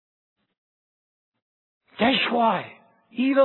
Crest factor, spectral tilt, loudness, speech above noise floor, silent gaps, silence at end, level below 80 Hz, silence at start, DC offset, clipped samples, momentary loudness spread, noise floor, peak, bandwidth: 18 dB; -8 dB/octave; -22 LUFS; over 69 dB; none; 0 s; -64 dBFS; 2 s; under 0.1%; under 0.1%; 16 LU; under -90 dBFS; -8 dBFS; 4.3 kHz